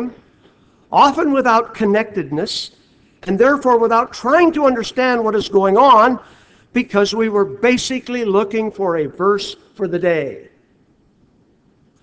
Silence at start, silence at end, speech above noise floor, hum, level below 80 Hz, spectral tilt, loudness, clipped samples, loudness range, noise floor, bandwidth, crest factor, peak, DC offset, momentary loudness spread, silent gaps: 0 s; 1.6 s; 40 dB; none; -54 dBFS; -5 dB/octave; -16 LUFS; under 0.1%; 6 LU; -55 dBFS; 8 kHz; 16 dB; 0 dBFS; under 0.1%; 11 LU; none